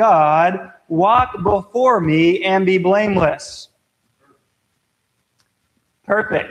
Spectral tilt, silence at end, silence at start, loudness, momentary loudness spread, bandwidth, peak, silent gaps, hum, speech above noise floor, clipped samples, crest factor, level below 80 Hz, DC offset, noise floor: -6.5 dB/octave; 0 s; 0 s; -16 LUFS; 10 LU; 10.5 kHz; 0 dBFS; none; none; 53 dB; under 0.1%; 16 dB; -46 dBFS; under 0.1%; -69 dBFS